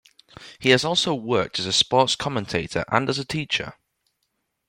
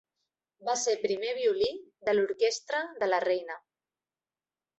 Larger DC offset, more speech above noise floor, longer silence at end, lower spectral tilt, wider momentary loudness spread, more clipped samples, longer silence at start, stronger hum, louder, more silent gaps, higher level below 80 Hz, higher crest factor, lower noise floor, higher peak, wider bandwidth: neither; second, 53 dB vs over 61 dB; second, 0.95 s vs 1.2 s; first, -3.5 dB/octave vs -2 dB/octave; about the same, 8 LU vs 8 LU; neither; second, 0.4 s vs 0.6 s; neither; first, -22 LUFS vs -30 LUFS; neither; first, -56 dBFS vs -72 dBFS; about the same, 22 dB vs 18 dB; second, -75 dBFS vs under -90 dBFS; first, -2 dBFS vs -12 dBFS; first, 16.5 kHz vs 8.2 kHz